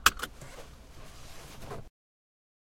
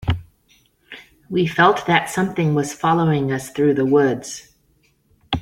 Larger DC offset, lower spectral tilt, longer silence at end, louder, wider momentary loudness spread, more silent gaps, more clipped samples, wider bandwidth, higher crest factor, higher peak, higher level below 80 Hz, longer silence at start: neither; second, -1 dB/octave vs -5.5 dB/octave; first, 0.85 s vs 0 s; second, -37 LUFS vs -19 LUFS; second, 12 LU vs 20 LU; neither; neither; about the same, 16.5 kHz vs 16 kHz; first, 34 dB vs 18 dB; about the same, -2 dBFS vs -2 dBFS; about the same, -50 dBFS vs -46 dBFS; about the same, 0 s vs 0 s